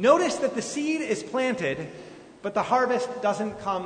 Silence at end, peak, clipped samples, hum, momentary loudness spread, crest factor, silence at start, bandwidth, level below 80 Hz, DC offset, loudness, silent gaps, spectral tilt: 0 s; -4 dBFS; under 0.1%; none; 13 LU; 22 dB; 0 s; 9.6 kHz; -64 dBFS; under 0.1%; -26 LUFS; none; -4.5 dB/octave